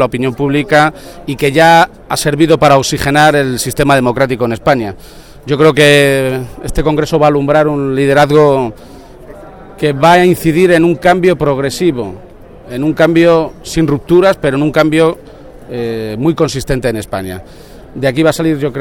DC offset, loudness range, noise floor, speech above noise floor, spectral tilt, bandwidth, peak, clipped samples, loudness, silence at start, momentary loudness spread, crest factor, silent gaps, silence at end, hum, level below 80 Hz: under 0.1%; 4 LU; -32 dBFS; 22 dB; -5.5 dB/octave; 18 kHz; 0 dBFS; 0.2%; -11 LUFS; 0 s; 13 LU; 12 dB; none; 0 s; none; -32 dBFS